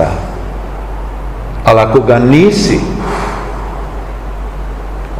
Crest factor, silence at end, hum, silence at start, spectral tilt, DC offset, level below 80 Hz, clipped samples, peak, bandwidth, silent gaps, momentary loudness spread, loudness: 12 dB; 0 s; none; 0 s; -6.5 dB/octave; 0.7%; -22 dBFS; 2%; 0 dBFS; 14.5 kHz; none; 16 LU; -11 LUFS